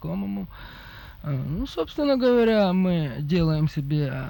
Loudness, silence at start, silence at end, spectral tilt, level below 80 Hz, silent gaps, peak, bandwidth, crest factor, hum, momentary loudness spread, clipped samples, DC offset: -24 LUFS; 0 s; 0 s; -8.5 dB/octave; -44 dBFS; none; -10 dBFS; 18.5 kHz; 14 dB; none; 20 LU; under 0.1%; under 0.1%